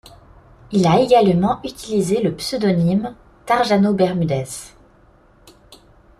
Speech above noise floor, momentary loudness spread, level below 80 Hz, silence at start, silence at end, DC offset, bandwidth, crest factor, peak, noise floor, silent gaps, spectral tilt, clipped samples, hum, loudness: 34 dB; 11 LU; -48 dBFS; 0.7 s; 0.45 s; under 0.1%; 14 kHz; 16 dB; -2 dBFS; -51 dBFS; none; -6.5 dB/octave; under 0.1%; none; -18 LUFS